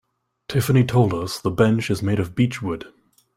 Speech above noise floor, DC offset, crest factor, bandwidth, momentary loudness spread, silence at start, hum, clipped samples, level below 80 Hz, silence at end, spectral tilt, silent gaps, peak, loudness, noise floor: 21 dB; under 0.1%; 18 dB; 16 kHz; 9 LU; 0.5 s; none; under 0.1%; -50 dBFS; 0.5 s; -6.5 dB/octave; none; -2 dBFS; -21 LUFS; -41 dBFS